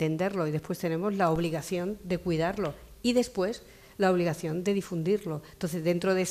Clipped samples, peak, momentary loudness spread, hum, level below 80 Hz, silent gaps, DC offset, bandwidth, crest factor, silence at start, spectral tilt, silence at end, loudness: under 0.1%; -14 dBFS; 7 LU; none; -56 dBFS; none; under 0.1%; 15 kHz; 16 dB; 0 s; -6 dB/octave; 0 s; -29 LUFS